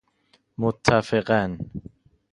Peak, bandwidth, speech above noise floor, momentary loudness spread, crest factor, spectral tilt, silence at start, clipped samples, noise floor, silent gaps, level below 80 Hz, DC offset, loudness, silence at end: 0 dBFS; 11 kHz; 42 dB; 18 LU; 24 dB; -6 dB/octave; 0.6 s; under 0.1%; -64 dBFS; none; -50 dBFS; under 0.1%; -23 LUFS; 0.55 s